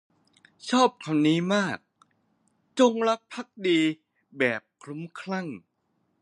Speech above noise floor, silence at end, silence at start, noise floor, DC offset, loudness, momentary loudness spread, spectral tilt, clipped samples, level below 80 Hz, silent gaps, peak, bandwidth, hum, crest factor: 48 dB; 0.65 s; 0.65 s; -74 dBFS; under 0.1%; -25 LUFS; 17 LU; -5 dB/octave; under 0.1%; -76 dBFS; none; -8 dBFS; 10.5 kHz; none; 20 dB